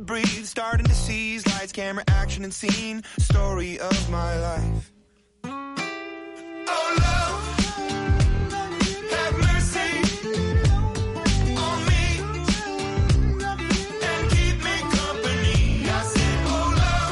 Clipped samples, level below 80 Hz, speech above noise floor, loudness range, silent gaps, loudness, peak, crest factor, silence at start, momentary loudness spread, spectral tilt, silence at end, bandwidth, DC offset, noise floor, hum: under 0.1%; -28 dBFS; 36 dB; 4 LU; none; -24 LUFS; -10 dBFS; 14 dB; 0 s; 8 LU; -5 dB/octave; 0 s; 11.5 kHz; under 0.1%; -59 dBFS; none